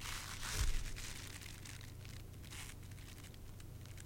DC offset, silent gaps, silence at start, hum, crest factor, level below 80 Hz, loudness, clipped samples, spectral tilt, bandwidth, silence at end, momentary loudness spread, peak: under 0.1%; none; 0 s; none; 20 dB; -48 dBFS; -47 LUFS; under 0.1%; -2.5 dB/octave; 17 kHz; 0 s; 13 LU; -24 dBFS